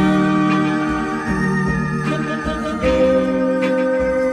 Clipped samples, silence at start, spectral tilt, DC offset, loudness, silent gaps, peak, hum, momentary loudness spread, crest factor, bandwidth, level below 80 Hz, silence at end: under 0.1%; 0 s; -7 dB/octave; under 0.1%; -18 LUFS; none; -6 dBFS; none; 6 LU; 12 dB; 11.5 kHz; -36 dBFS; 0 s